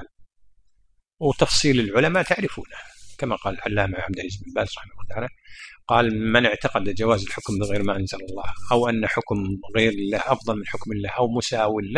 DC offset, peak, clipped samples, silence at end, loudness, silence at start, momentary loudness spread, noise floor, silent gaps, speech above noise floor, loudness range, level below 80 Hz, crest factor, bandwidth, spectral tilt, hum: under 0.1%; -2 dBFS; under 0.1%; 0 s; -23 LUFS; 0 s; 14 LU; -62 dBFS; none; 39 dB; 4 LU; -44 dBFS; 22 dB; 10.5 kHz; -5 dB/octave; none